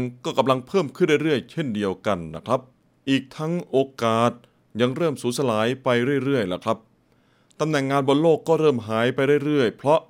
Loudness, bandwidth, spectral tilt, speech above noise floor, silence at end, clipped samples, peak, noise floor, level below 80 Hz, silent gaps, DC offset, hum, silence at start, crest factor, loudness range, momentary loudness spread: -23 LUFS; 16 kHz; -6 dB/octave; 39 dB; 0.05 s; under 0.1%; -4 dBFS; -61 dBFS; -66 dBFS; none; under 0.1%; none; 0 s; 18 dB; 3 LU; 8 LU